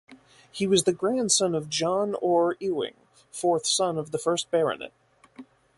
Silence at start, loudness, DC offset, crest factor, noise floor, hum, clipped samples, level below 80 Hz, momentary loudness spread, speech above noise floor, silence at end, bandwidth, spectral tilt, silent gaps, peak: 0.1 s; -25 LUFS; under 0.1%; 20 dB; -50 dBFS; none; under 0.1%; -68 dBFS; 11 LU; 24 dB; 0.35 s; 11.5 kHz; -3.5 dB/octave; none; -8 dBFS